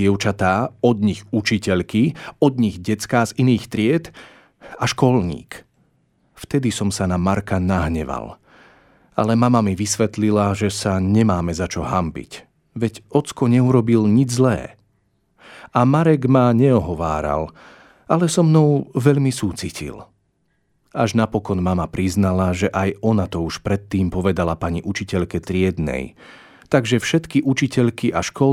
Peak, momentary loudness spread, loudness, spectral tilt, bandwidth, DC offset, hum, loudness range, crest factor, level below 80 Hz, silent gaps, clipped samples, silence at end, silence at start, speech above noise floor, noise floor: -2 dBFS; 10 LU; -19 LUFS; -6.5 dB/octave; 15 kHz; under 0.1%; none; 5 LU; 18 dB; -42 dBFS; none; under 0.1%; 0 s; 0 s; 48 dB; -66 dBFS